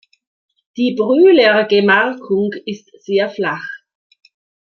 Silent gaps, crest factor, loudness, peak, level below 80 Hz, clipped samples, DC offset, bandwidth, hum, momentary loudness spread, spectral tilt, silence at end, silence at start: none; 14 dB; -14 LUFS; -2 dBFS; -66 dBFS; under 0.1%; under 0.1%; 6.6 kHz; none; 20 LU; -6.5 dB/octave; 0.85 s; 0.75 s